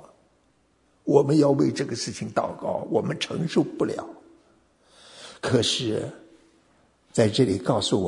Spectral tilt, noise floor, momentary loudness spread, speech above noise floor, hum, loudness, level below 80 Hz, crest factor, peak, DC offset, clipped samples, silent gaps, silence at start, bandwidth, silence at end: -5.5 dB/octave; -65 dBFS; 14 LU; 41 dB; none; -24 LUFS; -62 dBFS; 22 dB; -4 dBFS; under 0.1%; under 0.1%; none; 1.05 s; 11 kHz; 0 s